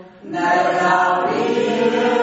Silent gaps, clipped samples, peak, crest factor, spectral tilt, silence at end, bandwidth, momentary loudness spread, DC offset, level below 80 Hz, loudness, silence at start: none; under 0.1%; -4 dBFS; 14 dB; -3 dB/octave; 0 s; 8 kHz; 4 LU; under 0.1%; -64 dBFS; -17 LUFS; 0 s